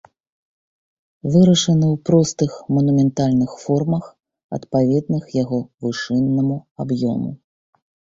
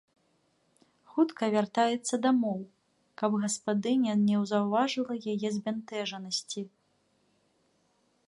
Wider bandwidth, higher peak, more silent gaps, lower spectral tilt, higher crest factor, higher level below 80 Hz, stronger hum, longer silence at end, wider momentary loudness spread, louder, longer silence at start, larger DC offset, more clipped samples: second, 7.8 kHz vs 11.5 kHz; first, -2 dBFS vs -14 dBFS; first, 4.44-4.49 s, 6.71-6.75 s vs none; first, -6.5 dB/octave vs -5 dB/octave; about the same, 16 dB vs 18 dB; first, -54 dBFS vs -76 dBFS; neither; second, 0.8 s vs 1.6 s; about the same, 11 LU vs 9 LU; first, -19 LUFS vs -30 LUFS; first, 1.25 s vs 1.1 s; neither; neither